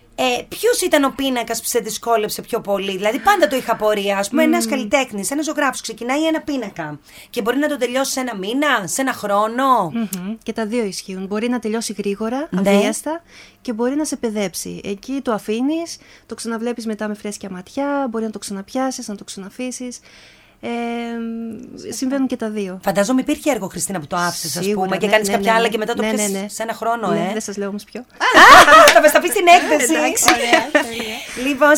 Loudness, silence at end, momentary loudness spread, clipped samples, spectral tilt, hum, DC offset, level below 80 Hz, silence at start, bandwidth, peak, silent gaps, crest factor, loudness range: -17 LUFS; 0 s; 15 LU; 0.1%; -3 dB/octave; none; under 0.1%; -52 dBFS; 0.2 s; over 20 kHz; 0 dBFS; none; 18 dB; 15 LU